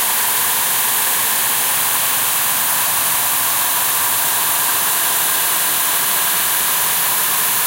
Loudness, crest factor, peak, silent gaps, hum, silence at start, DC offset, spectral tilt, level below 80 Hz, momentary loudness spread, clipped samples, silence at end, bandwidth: -14 LUFS; 14 dB; -2 dBFS; none; none; 0 s; under 0.1%; 1 dB/octave; -56 dBFS; 0 LU; under 0.1%; 0 s; 16.5 kHz